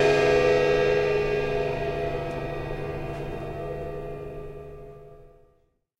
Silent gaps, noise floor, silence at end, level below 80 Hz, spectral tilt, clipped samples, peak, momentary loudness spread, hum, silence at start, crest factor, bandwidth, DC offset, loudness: none; -66 dBFS; 0.7 s; -42 dBFS; -6 dB/octave; under 0.1%; -10 dBFS; 19 LU; none; 0 s; 16 dB; 12.5 kHz; under 0.1%; -26 LUFS